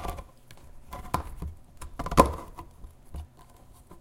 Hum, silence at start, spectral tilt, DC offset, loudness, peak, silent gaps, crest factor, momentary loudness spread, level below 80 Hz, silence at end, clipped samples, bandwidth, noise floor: none; 0 s; -5.5 dB/octave; under 0.1%; -28 LUFS; 0 dBFS; none; 32 dB; 24 LU; -40 dBFS; 0 s; under 0.1%; 16.5 kHz; -52 dBFS